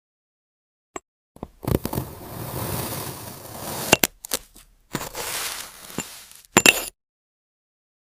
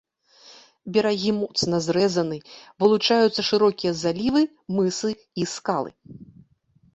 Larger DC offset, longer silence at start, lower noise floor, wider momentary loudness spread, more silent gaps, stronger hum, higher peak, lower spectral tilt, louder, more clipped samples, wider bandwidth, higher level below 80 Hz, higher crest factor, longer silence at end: neither; first, 0.95 s vs 0.5 s; second, -52 dBFS vs -61 dBFS; first, 24 LU vs 10 LU; first, 1.08-1.35 s vs none; neither; first, 0 dBFS vs -6 dBFS; second, -2.5 dB/octave vs -5 dB/octave; about the same, -23 LUFS vs -23 LUFS; neither; first, 16 kHz vs 8.2 kHz; first, -46 dBFS vs -60 dBFS; first, 28 dB vs 18 dB; first, 1.15 s vs 0.7 s